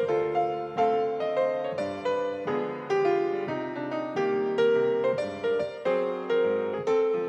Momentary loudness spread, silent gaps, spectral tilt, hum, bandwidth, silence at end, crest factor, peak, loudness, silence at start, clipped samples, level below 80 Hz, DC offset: 6 LU; none; -6.5 dB/octave; none; 8.2 kHz; 0 s; 14 dB; -14 dBFS; -27 LUFS; 0 s; under 0.1%; -74 dBFS; under 0.1%